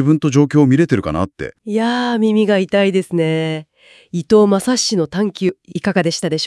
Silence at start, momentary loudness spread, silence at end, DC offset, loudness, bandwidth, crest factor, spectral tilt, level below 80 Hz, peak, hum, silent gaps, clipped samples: 0 s; 10 LU; 0 s; under 0.1%; -16 LUFS; 12 kHz; 14 dB; -5.5 dB/octave; -50 dBFS; 0 dBFS; none; none; under 0.1%